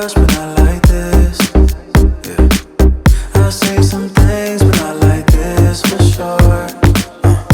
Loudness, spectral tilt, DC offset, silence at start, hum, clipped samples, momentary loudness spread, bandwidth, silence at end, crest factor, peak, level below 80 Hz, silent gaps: -12 LUFS; -6 dB/octave; under 0.1%; 0 s; none; 0.1%; 2 LU; 19.5 kHz; 0 s; 10 dB; 0 dBFS; -14 dBFS; none